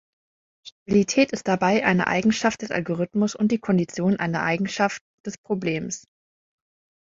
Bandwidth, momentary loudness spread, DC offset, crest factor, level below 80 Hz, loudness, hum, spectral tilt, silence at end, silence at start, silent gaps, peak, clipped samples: 7.8 kHz; 12 LU; under 0.1%; 20 dB; -60 dBFS; -23 LUFS; none; -5.5 dB/octave; 1.2 s; 0.65 s; 0.72-0.86 s, 5.01-5.24 s, 5.38-5.44 s; -4 dBFS; under 0.1%